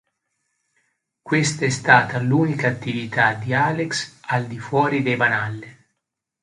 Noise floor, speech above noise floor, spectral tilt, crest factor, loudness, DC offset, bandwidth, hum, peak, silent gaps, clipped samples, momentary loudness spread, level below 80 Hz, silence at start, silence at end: -80 dBFS; 60 dB; -5 dB/octave; 22 dB; -20 LUFS; under 0.1%; 11 kHz; none; 0 dBFS; none; under 0.1%; 10 LU; -60 dBFS; 1.25 s; 0.7 s